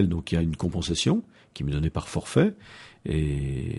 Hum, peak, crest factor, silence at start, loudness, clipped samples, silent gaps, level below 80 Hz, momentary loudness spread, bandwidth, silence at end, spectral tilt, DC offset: none; -8 dBFS; 18 dB; 0 s; -27 LUFS; under 0.1%; none; -38 dBFS; 13 LU; 11.5 kHz; 0 s; -6 dB/octave; under 0.1%